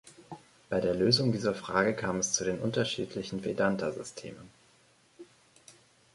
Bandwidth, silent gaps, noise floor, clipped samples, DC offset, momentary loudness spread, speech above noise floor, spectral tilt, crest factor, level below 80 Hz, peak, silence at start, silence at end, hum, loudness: 11.5 kHz; none; -64 dBFS; under 0.1%; under 0.1%; 23 LU; 34 dB; -4 dB/octave; 22 dB; -62 dBFS; -10 dBFS; 0.05 s; 0.45 s; none; -30 LUFS